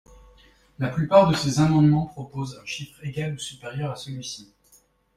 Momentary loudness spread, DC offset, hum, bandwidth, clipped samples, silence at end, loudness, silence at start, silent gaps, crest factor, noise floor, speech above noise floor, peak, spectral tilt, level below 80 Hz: 16 LU; under 0.1%; none; 13 kHz; under 0.1%; 0.75 s; -24 LUFS; 0.8 s; none; 22 dB; -60 dBFS; 37 dB; -4 dBFS; -6.5 dB/octave; -52 dBFS